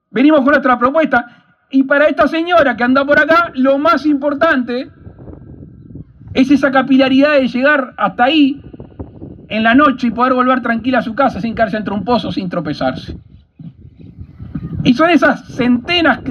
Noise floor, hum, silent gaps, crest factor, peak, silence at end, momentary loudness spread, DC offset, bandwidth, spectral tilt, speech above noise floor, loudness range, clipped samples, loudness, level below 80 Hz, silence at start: -38 dBFS; none; none; 14 dB; 0 dBFS; 0 s; 12 LU; under 0.1%; 6.8 kHz; -6.5 dB/octave; 25 dB; 6 LU; under 0.1%; -13 LUFS; -44 dBFS; 0.15 s